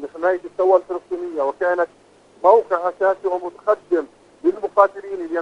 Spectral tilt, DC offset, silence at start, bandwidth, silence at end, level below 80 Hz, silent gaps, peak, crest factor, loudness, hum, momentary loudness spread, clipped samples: -6 dB/octave; under 0.1%; 0 s; 8.4 kHz; 0 s; -64 dBFS; none; 0 dBFS; 20 dB; -20 LUFS; 50 Hz at -65 dBFS; 11 LU; under 0.1%